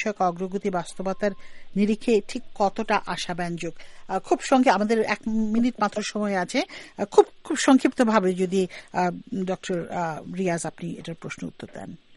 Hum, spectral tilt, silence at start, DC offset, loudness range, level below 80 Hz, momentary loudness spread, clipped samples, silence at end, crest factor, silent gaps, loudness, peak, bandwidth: none; -5 dB/octave; 0 s; under 0.1%; 5 LU; -50 dBFS; 15 LU; under 0.1%; 0.2 s; 22 dB; none; -25 LUFS; -2 dBFS; 11.5 kHz